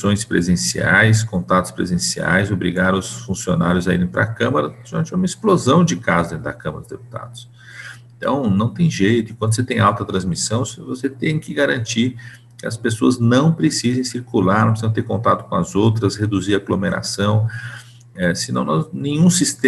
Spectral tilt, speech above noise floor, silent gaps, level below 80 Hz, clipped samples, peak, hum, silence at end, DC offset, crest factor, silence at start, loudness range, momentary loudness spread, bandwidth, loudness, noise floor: -5 dB/octave; 19 dB; none; -46 dBFS; under 0.1%; -2 dBFS; none; 0 s; under 0.1%; 16 dB; 0 s; 3 LU; 14 LU; 12.5 kHz; -18 LUFS; -37 dBFS